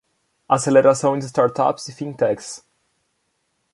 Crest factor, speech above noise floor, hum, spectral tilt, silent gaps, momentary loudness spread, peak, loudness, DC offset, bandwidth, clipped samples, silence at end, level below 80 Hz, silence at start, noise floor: 18 dB; 52 dB; none; -5.5 dB/octave; none; 16 LU; -2 dBFS; -19 LUFS; under 0.1%; 11.5 kHz; under 0.1%; 1.15 s; -64 dBFS; 0.5 s; -70 dBFS